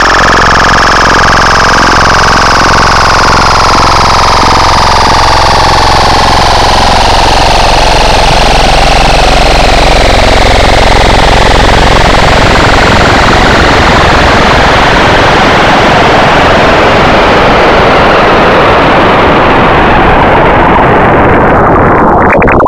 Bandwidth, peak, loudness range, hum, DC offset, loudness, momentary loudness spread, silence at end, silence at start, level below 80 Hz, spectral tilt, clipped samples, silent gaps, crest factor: 15 kHz; 0 dBFS; 1 LU; none; under 0.1%; -4 LUFS; 1 LU; 0 s; 0 s; -12 dBFS; -4 dB/octave; 8%; none; 4 dB